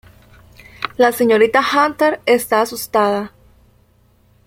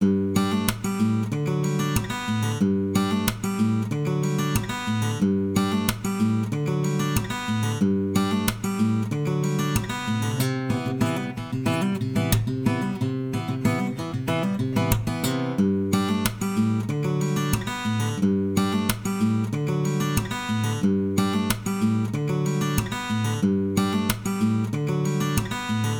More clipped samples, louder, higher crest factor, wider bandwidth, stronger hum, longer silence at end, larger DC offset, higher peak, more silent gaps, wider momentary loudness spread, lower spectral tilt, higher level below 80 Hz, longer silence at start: neither; first, -15 LUFS vs -25 LUFS; about the same, 16 dB vs 20 dB; second, 16.5 kHz vs over 20 kHz; first, 60 Hz at -45 dBFS vs none; first, 1.2 s vs 0 s; neither; about the same, -2 dBFS vs -4 dBFS; neither; first, 12 LU vs 3 LU; second, -3.5 dB/octave vs -6 dB/octave; second, -54 dBFS vs -44 dBFS; first, 0.8 s vs 0 s